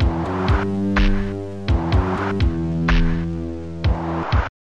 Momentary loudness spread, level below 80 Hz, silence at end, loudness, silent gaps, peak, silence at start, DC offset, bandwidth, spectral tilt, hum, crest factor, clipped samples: 7 LU; -24 dBFS; 0.3 s; -22 LUFS; none; -6 dBFS; 0 s; 1%; 8 kHz; -7.5 dB/octave; none; 12 dB; under 0.1%